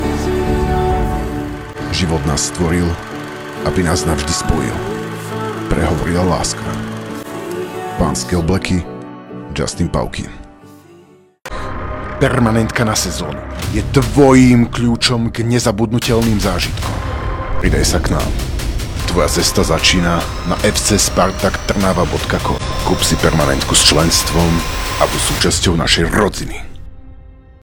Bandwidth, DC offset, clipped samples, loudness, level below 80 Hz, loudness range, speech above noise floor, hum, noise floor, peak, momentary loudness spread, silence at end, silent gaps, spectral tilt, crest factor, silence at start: over 20 kHz; under 0.1%; 0.1%; -15 LUFS; -24 dBFS; 7 LU; 31 dB; none; -45 dBFS; 0 dBFS; 13 LU; 0.25 s; none; -4.5 dB/octave; 16 dB; 0 s